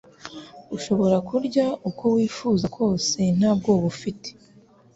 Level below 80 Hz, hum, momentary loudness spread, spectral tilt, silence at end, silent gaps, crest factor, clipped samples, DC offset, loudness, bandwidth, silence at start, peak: -56 dBFS; none; 18 LU; -6 dB/octave; 0.65 s; none; 16 dB; under 0.1%; under 0.1%; -23 LUFS; 8 kHz; 0.25 s; -6 dBFS